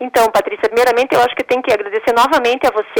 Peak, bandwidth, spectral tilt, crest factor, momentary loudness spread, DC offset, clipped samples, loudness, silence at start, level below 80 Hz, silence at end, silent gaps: -6 dBFS; 19.5 kHz; -3 dB/octave; 8 dB; 4 LU; under 0.1%; under 0.1%; -14 LUFS; 0 s; -50 dBFS; 0 s; none